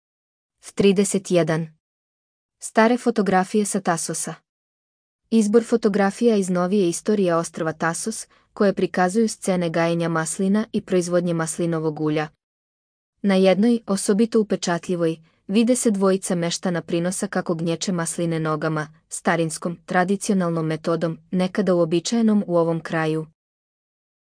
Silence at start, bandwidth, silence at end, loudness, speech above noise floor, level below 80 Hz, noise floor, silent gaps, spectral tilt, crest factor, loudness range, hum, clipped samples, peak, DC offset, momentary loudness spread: 0.65 s; 10.5 kHz; 1.1 s; -21 LUFS; over 69 dB; -64 dBFS; under -90 dBFS; 1.80-2.49 s, 4.49-5.19 s, 12.43-13.13 s; -5.5 dB/octave; 18 dB; 3 LU; none; under 0.1%; -4 dBFS; under 0.1%; 8 LU